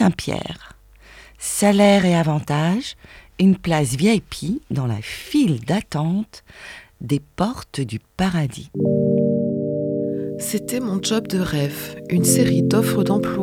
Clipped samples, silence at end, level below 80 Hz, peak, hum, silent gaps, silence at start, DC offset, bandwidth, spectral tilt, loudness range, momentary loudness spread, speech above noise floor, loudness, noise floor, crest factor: under 0.1%; 0 s; -48 dBFS; -2 dBFS; none; none; 0 s; under 0.1%; 17 kHz; -5.5 dB/octave; 5 LU; 13 LU; 26 dB; -20 LUFS; -46 dBFS; 18 dB